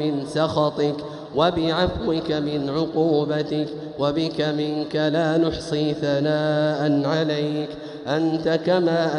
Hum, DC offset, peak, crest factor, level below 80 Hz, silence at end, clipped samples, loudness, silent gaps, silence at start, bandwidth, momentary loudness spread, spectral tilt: none; under 0.1%; -6 dBFS; 16 dB; -48 dBFS; 0 s; under 0.1%; -22 LUFS; none; 0 s; 11 kHz; 6 LU; -6.5 dB/octave